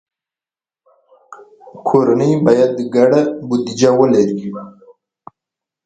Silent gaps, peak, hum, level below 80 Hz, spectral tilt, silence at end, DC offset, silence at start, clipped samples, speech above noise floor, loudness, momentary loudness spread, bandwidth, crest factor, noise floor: none; 0 dBFS; none; -58 dBFS; -6.5 dB/octave; 1.15 s; under 0.1%; 1.3 s; under 0.1%; over 77 dB; -14 LUFS; 12 LU; 9 kHz; 16 dB; under -90 dBFS